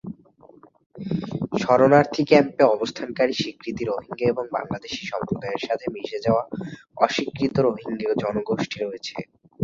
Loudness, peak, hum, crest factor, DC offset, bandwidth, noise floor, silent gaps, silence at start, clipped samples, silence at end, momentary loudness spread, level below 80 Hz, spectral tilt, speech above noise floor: -23 LUFS; -2 dBFS; none; 22 dB; under 0.1%; 7.6 kHz; -52 dBFS; 0.86-0.90 s; 0.05 s; under 0.1%; 0 s; 15 LU; -56 dBFS; -6 dB/octave; 29 dB